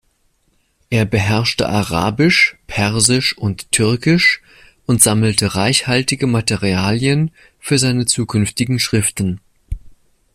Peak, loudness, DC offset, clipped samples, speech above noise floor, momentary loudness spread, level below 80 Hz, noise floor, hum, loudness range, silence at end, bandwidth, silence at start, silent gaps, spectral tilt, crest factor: 0 dBFS; -15 LUFS; under 0.1%; under 0.1%; 46 dB; 11 LU; -40 dBFS; -61 dBFS; none; 3 LU; 0.45 s; 16 kHz; 0.9 s; none; -4 dB/octave; 16 dB